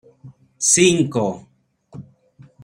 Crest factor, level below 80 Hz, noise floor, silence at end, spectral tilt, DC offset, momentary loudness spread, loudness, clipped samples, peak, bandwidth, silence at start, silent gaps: 20 dB; -60 dBFS; -50 dBFS; 0.6 s; -3.5 dB/octave; under 0.1%; 12 LU; -16 LUFS; under 0.1%; -2 dBFS; 16 kHz; 0.25 s; none